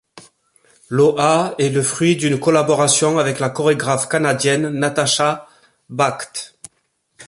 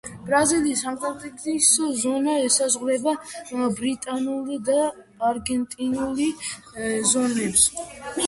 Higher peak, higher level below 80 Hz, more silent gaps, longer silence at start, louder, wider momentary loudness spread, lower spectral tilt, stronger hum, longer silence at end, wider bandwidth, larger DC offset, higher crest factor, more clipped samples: about the same, -2 dBFS vs -4 dBFS; about the same, -60 dBFS vs -56 dBFS; neither; about the same, 0.15 s vs 0.05 s; first, -17 LUFS vs -22 LUFS; about the same, 11 LU vs 13 LU; first, -4 dB/octave vs -2.5 dB/octave; neither; about the same, 0 s vs 0 s; about the same, 11.5 kHz vs 12 kHz; neither; about the same, 16 dB vs 20 dB; neither